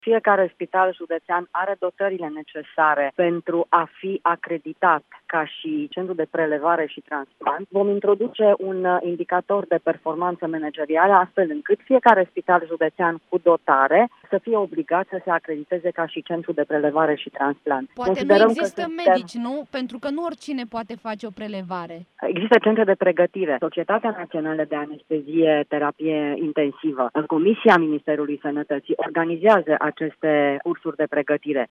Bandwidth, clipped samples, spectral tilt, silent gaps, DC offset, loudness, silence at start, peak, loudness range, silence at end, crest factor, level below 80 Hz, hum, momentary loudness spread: 10.5 kHz; under 0.1%; -6.5 dB/octave; none; under 0.1%; -22 LUFS; 0.05 s; 0 dBFS; 4 LU; 0.05 s; 22 dB; -70 dBFS; none; 12 LU